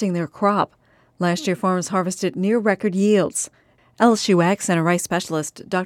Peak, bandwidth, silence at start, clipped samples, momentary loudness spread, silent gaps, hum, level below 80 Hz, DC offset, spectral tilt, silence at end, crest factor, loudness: -4 dBFS; 15.5 kHz; 0 s; under 0.1%; 8 LU; none; none; -64 dBFS; under 0.1%; -5 dB/octave; 0 s; 16 dB; -20 LUFS